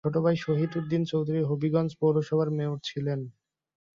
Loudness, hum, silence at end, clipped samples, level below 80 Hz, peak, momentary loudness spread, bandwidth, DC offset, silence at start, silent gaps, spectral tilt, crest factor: -28 LUFS; none; 0.65 s; under 0.1%; -66 dBFS; -12 dBFS; 6 LU; 7.4 kHz; under 0.1%; 0.05 s; none; -8 dB/octave; 16 dB